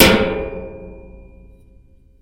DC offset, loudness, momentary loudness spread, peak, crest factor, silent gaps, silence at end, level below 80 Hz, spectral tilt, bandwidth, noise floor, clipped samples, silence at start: under 0.1%; -18 LUFS; 25 LU; 0 dBFS; 20 dB; none; 1.15 s; -34 dBFS; -4 dB/octave; 16.5 kHz; -48 dBFS; under 0.1%; 0 s